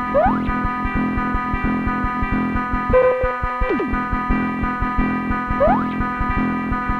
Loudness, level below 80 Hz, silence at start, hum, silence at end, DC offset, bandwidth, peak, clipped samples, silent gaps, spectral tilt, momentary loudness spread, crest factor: -20 LUFS; -28 dBFS; 0 s; none; 0 s; under 0.1%; 7 kHz; -4 dBFS; under 0.1%; none; -9 dB/octave; 5 LU; 16 dB